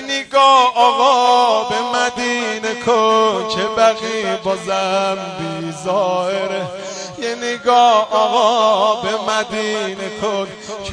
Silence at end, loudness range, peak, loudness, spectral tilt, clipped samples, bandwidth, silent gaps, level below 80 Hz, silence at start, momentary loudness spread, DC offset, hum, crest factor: 0 s; 6 LU; 0 dBFS; -16 LUFS; -3 dB/octave; under 0.1%; 10 kHz; none; -56 dBFS; 0 s; 12 LU; under 0.1%; none; 16 dB